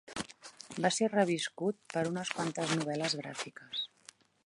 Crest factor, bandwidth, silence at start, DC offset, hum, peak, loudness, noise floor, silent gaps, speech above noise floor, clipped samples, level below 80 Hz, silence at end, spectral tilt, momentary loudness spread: 22 dB; 11.5 kHz; 0.05 s; under 0.1%; none; -14 dBFS; -34 LUFS; -60 dBFS; none; 26 dB; under 0.1%; -74 dBFS; 0.6 s; -4 dB/octave; 13 LU